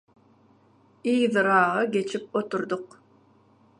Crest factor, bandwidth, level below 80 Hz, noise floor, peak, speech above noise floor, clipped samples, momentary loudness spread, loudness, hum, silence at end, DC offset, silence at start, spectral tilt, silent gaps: 20 dB; 10.5 kHz; -78 dBFS; -60 dBFS; -6 dBFS; 36 dB; under 0.1%; 12 LU; -25 LUFS; none; 0.95 s; under 0.1%; 1.05 s; -5.5 dB/octave; none